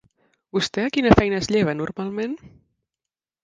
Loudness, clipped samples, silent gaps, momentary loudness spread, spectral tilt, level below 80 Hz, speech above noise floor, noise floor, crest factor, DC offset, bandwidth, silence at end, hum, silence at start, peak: -21 LUFS; under 0.1%; none; 12 LU; -5.5 dB/octave; -42 dBFS; 67 dB; -88 dBFS; 24 dB; under 0.1%; 9.6 kHz; 0.95 s; none; 0.55 s; 0 dBFS